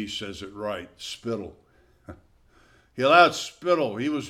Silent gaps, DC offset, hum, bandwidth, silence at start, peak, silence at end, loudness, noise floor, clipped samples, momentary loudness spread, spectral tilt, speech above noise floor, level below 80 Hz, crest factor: none; under 0.1%; none; 15 kHz; 0 s; -4 dBFS; 0 s; -24 LUFS; -59 dBFS; under 0.1%; 20 LU; -4 dB/octave; 34 dB; -60 dBFS; 24 dB